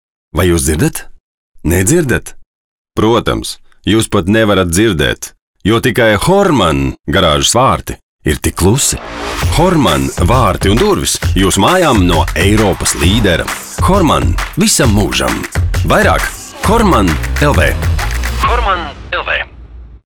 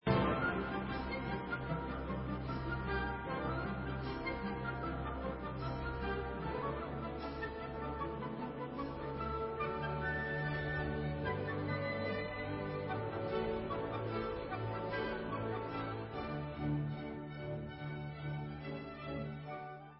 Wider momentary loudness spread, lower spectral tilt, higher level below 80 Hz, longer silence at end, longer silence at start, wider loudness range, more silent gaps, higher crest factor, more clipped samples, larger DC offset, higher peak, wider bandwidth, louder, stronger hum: first, 9 LU vs 6 LU; about the same, -4.5 dB/octave vs -5.5 dB/octave; first, -22 dBFS vs -50 dBFS; about the same, 0.1 s vs 0 s; first, 0.35 s vs 0.05 s; about the same, 3 LU vs 3 LU; first, 1.20-1.54 s, 2.46-2.85 s, 5.42-5.54 s, 7.00-7.04 s, 8.03-8.19 s vs none; second, 12 dB vs 20 dB; neither; first, 0.2% vs under 0.1%; first, 0 dBFS vs -20 dBFS; first, 19.5 kHz vs 5.6 kHz; first, -12 LUFS vs -40 LUFS; neither